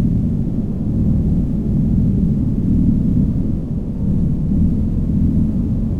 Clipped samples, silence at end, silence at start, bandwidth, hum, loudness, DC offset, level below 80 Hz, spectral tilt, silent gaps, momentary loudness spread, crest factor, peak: under 0.1%; 0 s; 0 s; 3.9 kHz; none; -18 LUFS; under 0.1%; -22 dBFS; -12 dB/octave; none; 5 LU; 10 dB; -6 dBFS